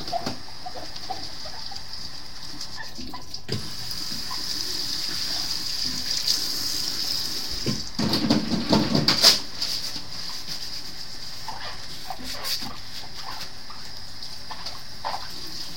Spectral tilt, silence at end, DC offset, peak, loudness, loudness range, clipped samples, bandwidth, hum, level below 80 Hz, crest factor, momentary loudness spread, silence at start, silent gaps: -2.5 dB/octave; 0 s; 3%; -2 dBFS; -26 LUFS; 12 LU; under 0.1%; 17 kHz; none; -48 dBFS; 28 dB; 14 LU; 0 s; none